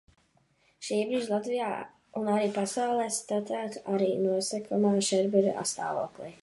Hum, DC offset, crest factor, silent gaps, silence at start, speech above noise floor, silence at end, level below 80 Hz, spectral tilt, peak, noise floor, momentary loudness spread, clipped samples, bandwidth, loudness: none; under 0.1%; 18 dB; none; 0.8 s; 39 dB; 0.1 s; -74 dBFS; -4.5 dB/octave; -10 dBFS; -68 dBFS; 9 LU; under 0.1%; 11.5 kHz; -29 LUFS